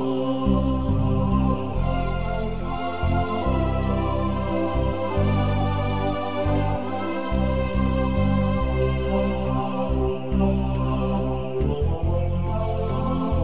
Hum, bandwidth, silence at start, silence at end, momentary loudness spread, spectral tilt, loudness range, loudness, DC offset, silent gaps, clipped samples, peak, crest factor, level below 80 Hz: none; 4 kHz; 0 s; 0 s; 4 LU; -12 dB/octave; 1 LU; -24 LUFS; 2%; none; under 0.1%; -8 dBFS; 14 dB; -28 dBFS